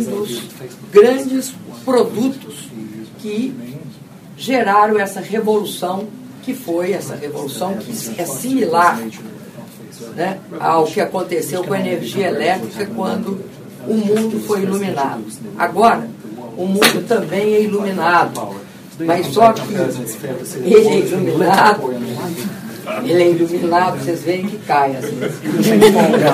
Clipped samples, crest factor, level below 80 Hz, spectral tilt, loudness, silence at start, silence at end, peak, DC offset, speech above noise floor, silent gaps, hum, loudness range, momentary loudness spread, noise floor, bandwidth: under 0.1%; 16 dB; -60 dBFS; -5 dB/octave; -16 LUFS; 0 s; 0 s; 0 dBFS; under 0.1%; 20 dB; none; none; 6 LU; 18 LU; -36 dBFS; 15.5 kHz